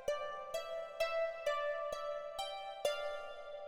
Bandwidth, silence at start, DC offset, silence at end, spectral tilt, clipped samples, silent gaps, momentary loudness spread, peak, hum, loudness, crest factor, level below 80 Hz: 16.5 kHz; 0 s; under 0.1%; 0 s; -0.5 dB/octave; under 0.1%; none; 6 LU; -22 dBFS; none; -40 LUFS; 18 dB; -68 dBFS